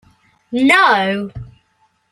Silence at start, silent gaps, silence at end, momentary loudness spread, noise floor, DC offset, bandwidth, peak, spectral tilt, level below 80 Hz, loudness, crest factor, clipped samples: 0.5 s; none; 0.65 s; 19 LU; -61 dBFS; under 0.1%; 13.5 kHz; 0 dBFS; -4.5 dB/octave; -48 dBFS; -14 LUFS; 16 dB; under 0.1%